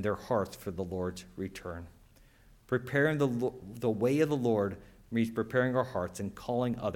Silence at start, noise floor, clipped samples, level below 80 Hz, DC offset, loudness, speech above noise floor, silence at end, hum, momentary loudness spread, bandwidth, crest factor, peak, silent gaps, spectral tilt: 0 s; -60 dBFS; under 0.1%; -60 dBFS; under 0.1%; -32 LUFS; 28 dB; 0 s; none; 12 LU; 17.5 kHz; 18 dB; -14 dBFS; none; -7 dB/octave